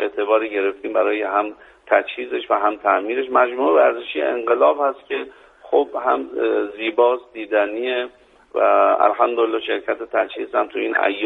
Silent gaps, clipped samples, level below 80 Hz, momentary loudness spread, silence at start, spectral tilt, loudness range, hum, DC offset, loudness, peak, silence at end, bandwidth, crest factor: none; under 0.1%; -64 dBFS; 9 LU; 0 s; -5.5 dB/octave; 2 LU; none; under 0.1%; -19 LUFS; 0 dBFS; 0 s; 4 kHz; 18 dB